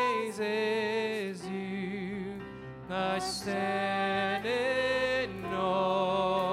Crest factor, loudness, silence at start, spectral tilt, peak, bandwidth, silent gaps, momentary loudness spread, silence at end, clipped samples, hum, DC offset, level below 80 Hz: 14 dB; -31 LUFS; 0 s; -4.5 dB/octave; -16 dBFS; 15.5 kHz; none; 9 LU; 0 s; under 0.1%; none; under 0.1%; -60 dBFS